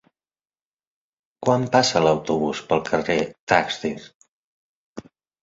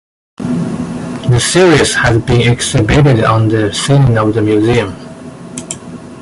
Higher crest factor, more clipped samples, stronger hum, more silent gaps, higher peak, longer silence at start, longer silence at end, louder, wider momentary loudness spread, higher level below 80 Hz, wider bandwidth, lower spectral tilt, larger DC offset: first, 22 dB vs 12 dB; neither; neither; first, 3.39-3.47 s, 4.15-4.20 s, 4.28-4.96 s vs none; about the same, -2 dBFS vs 0 dBFS; first, 1.4 s vs 0.4 s; first, 0.4 s vs 0 s; second, -21 LUFS vs -11 LUFS; first, 23 LU vs 17 LU; second, -56 dBFS vs -30 dBFS; second, 7.8 kHz vs 11.5 kHz; about the same, -4.5 dB/octave vs -5.5 dB/octave; neither